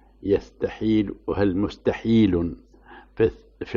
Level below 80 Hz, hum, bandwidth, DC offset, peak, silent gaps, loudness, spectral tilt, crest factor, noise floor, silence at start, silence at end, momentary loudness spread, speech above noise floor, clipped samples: -44 dBFS; none; 7 kHz; under 0.1%; -8 dBFS; none; -23 LUFS; -8.5 dB/octave; 14 dB; -48 dBFS; 0.2 s; 0 s; 11 LU; 26 dB; under 0.1%